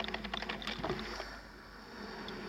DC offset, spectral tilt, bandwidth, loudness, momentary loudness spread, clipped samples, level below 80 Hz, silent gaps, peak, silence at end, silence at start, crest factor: under 0.1%; -4.5 dB/octave; 16.5 kHz; -41 LUFS; 11 LU; under 0.1%; -54 dBFS; none; -20 dBFS; 0 s; 0 s; 22 dB